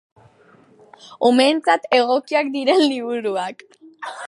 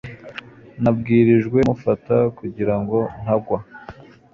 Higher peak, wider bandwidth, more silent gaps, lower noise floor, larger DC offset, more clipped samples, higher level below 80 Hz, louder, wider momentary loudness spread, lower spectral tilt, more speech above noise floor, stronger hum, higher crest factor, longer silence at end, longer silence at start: about the same, -2 dBFS vs -4 dBFS; first, 11.5 kHz vs 7.2 kHz; neither; first, -52 dBFS vs -41 dBFS; neither; neither; second, -76 dBFS vs -48 dBFS; about the same, -18 LUFS vs -19 LUFS; second, 12 LU vs 20 LU; second, -3.5 dB/octave vs -9.5 dB/octave; first, 34 dB vs 23 dB; neither; about the same, 18 dB vs 16 dB; second, 0 s vs 0.4 s; first, 1.05 s vs 0.05 s